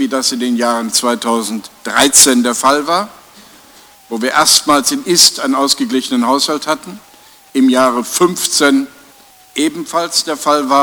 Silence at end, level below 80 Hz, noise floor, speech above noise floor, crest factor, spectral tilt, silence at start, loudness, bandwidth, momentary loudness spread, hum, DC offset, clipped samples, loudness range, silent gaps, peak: 0 s; -56 dBFS; -43 dBFS; 30 dB; 14 dB; -1.5 dB/octave; 0 s; -12 LUFS; over 20 kHz; 12 LU; none; under 0.1%; 0.1%; 3 LU; none; 0 dBFS